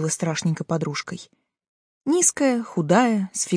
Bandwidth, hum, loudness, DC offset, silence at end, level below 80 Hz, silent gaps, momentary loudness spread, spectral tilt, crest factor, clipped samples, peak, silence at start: 10.5 kHz; none; -22 LUFS; under 0.1%; 0 s; -68 dBFS; 1.69-2.01 s; 13 LU; -4.5 dB/octave; 20 dB; under 0.1%; -4 dBFS; 0 s